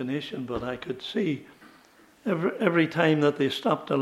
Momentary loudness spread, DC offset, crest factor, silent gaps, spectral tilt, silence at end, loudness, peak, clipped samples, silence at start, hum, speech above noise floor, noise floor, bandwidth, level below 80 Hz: 11 LU; under 0.1%; 22 dB; none; -6.5 dB/octave; 0 s; -27 LUFS; -6 dBFS; under 0.1%; 0 s; none; 30 dB; -56 dBFS; 14.5 kHz; -60 dBFS